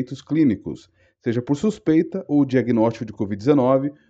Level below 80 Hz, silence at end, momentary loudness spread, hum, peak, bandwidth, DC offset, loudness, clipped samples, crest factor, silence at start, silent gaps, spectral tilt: -56 dBFS; 0.15 s; 11 LU; none; -4 dBFS; 8 kHz; under 0.1%; -21 LUFS; under 0.1%; 16 dB; 0 s; none; -8 dB/octave